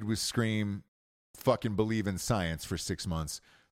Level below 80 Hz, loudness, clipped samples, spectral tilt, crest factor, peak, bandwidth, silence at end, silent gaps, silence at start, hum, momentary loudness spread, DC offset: -52 dBFS; -32 LUFS; under 0.1%; -5 dB/octave; 20 dB; -14 dBFS; 16.5 kHz; 0.35 s; 0.88-1.34 s; 0 s; none; 7 LU; under 0.1%